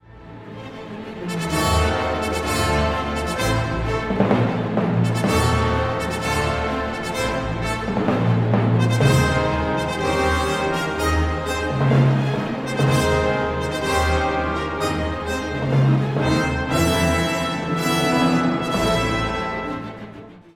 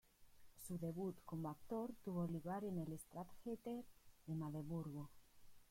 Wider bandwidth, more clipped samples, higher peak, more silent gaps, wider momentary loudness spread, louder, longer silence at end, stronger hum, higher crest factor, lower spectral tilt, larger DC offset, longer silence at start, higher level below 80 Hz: about the same, 17 kHz vs 16.5 kHz; neither; first, -2 dBFS vs -36 dBFS; neither; about the same, 7 LU vs 9 LU; first, -21 LUFS vs -49 LUFS; about the same, 0.15 s vs 0.05 s; neither; about the same, 18 dB vs 14 dB; second, -5.5 dB/octave vs -8 dB/octave; neither; about the same, 0.1 s vs 0.2 s; first, -32 dBFS vs -72 dBFS